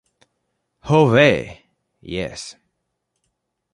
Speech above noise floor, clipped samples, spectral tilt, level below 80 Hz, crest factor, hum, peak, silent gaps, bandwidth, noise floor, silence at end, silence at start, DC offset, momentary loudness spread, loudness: 58 dB; under 0.1%; -6 dB/octave; -50 dBFS; 20 dB; none; -2 dBFS; none; 11.5 kHz; -75 dBFS; 1.2 s; 0.85 s; under 0.1%; 23 LU; -17 LUFS